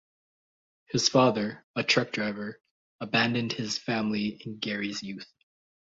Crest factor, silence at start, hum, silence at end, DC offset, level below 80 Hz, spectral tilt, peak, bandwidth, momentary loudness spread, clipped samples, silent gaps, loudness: 22 dB; 0.9 s; none; 0.7 s; under 0.1%; -68 dBFS; -4 dB/octave; -8 dBFS; 8 kHz; 14 LU; under 0.1%; 1.64-1.74 s, 2.71-2.99 s; -28 LUFS